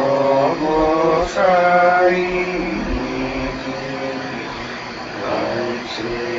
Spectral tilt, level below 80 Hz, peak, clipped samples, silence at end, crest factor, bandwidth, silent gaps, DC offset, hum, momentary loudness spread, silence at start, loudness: -5.5 dB/octave; -38 dBFS; -2 dBFS; under 0.1%; 0 s; 16 dB; 7.8 kHz; none; under 0.1%; none; 13 LU; 0 s; -19 LUFS